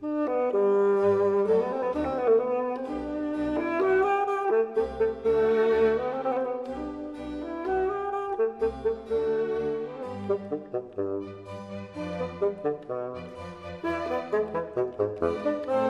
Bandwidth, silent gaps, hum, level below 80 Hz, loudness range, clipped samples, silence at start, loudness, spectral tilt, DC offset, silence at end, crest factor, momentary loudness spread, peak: 7.6 kHz; none; none; -54 dBFS; 7 LU; under 0.1%; 0 s; -28 LUFS; -7.5 dB/octave; under 0.1%; 0 s; 16 dB; 13 LU; -12 dBFS